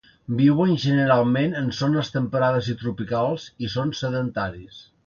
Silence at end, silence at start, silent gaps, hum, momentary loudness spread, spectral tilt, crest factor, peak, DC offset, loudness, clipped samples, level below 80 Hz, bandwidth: 0.25 s; 0.3 s; none; none; 11 LU; -7 dB/octave; 16 dB; -6 dBFS; under 0.1%; -23 LUFS; under 0.1%; -54 dBFS; 7.2 kHz